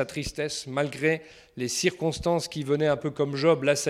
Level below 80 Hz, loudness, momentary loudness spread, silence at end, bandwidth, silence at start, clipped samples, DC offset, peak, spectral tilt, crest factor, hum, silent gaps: -52 dBFS; -27 LUFS; 8 LU; 0 s; 15.5 kHz; 0 s; under 0.1%; under 0.1%; -8 dBFS; -4.5 dB/octave; 18 dB; none; none